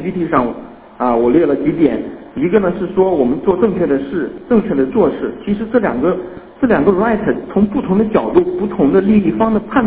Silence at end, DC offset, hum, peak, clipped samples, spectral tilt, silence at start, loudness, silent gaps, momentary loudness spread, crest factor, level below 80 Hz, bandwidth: 0 s; under 0.1%; none; 0 dBFS; under 0.1%; -12 dB/octave; 0 s; -15 LUFS; none; 8 LU; 14 dB; -42 dBFS; 4 kHz